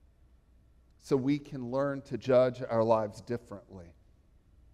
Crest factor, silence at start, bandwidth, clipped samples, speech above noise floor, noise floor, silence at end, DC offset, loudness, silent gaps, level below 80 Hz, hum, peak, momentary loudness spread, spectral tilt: 20 dB; 1.05 s; 12 kHz; under 0.1%; 32 dB; -62 dBFS; 0.85 s; under 0.1%; -30 LUFS; none; -62 dBFS; none; -12 dBFS; 21 LU; -7.5 dB/octave